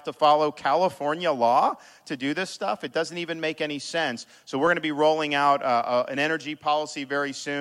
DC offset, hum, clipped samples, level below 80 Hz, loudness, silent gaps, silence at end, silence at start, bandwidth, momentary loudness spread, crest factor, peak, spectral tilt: under 0.1%; none; under 0.1%; -74 dBFS; -25 LUFS; none; 0 s; 0.05 s; 13 kHz; 8 LU; 16 dB; -8 dBFS; -4 dB/octave